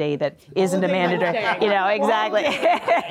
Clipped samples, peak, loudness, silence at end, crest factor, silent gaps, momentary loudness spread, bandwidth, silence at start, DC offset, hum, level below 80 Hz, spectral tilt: under 0.1%; -10 dBFS; -20 LUFS; 0 s; 10 dB; none; 5 LU; 15.5 kHz; 0 s; under 0.1%; none; -68 dBFS; -5 dB/octave